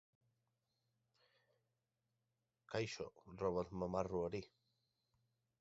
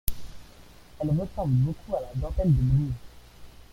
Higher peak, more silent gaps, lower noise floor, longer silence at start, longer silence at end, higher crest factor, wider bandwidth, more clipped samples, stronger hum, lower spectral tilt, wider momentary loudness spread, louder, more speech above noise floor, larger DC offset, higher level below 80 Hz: second, -24 dBFS vs -6 dBFS; neither; first, -89 dBFS vs -49 dBFS; first, 2.7 s vs 0.05 s; first, 1.15 s vs 0.2 s; about the same, 24 dB vs 22 dB; second, 7.6 kHz vs 16.5 kHz; neither; neither; second, -5.5 dB/octave vs -8.5 dB/octave; second, 9 LU vs 13 LU; second, -44 LUFS vs -27 LUFS; first, 46 dB vs 24 dB; neither; second, -70 dBFS vs -38 dBFS